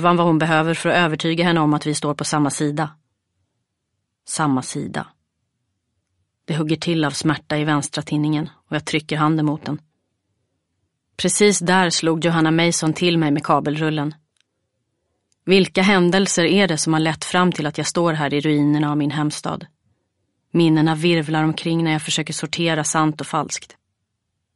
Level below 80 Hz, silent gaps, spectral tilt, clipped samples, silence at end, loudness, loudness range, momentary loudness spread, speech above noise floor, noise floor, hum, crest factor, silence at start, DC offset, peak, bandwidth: -60 dBFS; none; -4.5 dB/octave; under 0.1%; 0.9 s; -19 LUFS; 7 LU; 11 LU; 57 dB; -76 dBFS; none; 18 dB; 0 s; under 0.1%; -2 dBFS; 11.5 kHz